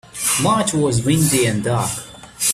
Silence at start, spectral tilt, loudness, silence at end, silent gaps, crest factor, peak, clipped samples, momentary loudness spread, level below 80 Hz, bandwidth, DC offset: 0.15 s; -4 dB/octave; -17 LUFS; 0 s; none; 16 dB; -4 dBFS; under 0.1%; 8 LU; -46 dBFS; 16 kHz; under 0.1%